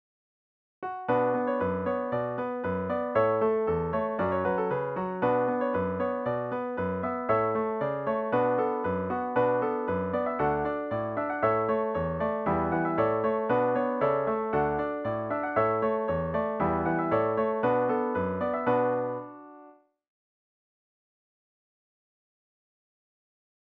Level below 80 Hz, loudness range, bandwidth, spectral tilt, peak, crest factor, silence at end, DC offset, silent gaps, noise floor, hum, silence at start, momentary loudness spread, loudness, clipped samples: -56 dBFS; 3 LU; 4.8 kHz; -10 dB/octave; -12 dBFS; 16 dB; 3.9 s; under 0.1%; none; -55 dBFS; none; 0.8 s; 5 LU; -28 LUFS; under 0.1%